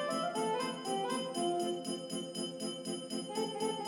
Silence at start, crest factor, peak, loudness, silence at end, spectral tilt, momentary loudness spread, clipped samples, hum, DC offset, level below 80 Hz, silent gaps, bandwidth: 0 s; 14 dB; -22 dBFS; -37 LUFS; 0 s; -3.5 dB/octave; 5 LU; under 0.1%; none; under 0.1%; -80 dBFS; none; 17.5 kHz